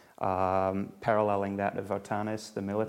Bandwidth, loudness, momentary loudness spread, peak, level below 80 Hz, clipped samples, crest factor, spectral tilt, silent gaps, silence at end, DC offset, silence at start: 16 kHz; -31 LUFS; 7 LU; -12 dBFS; -68 dBFS; under 0.1%; 18 dB; -7 dB/octave; none; 0 s; under 0.1%; 0.2 s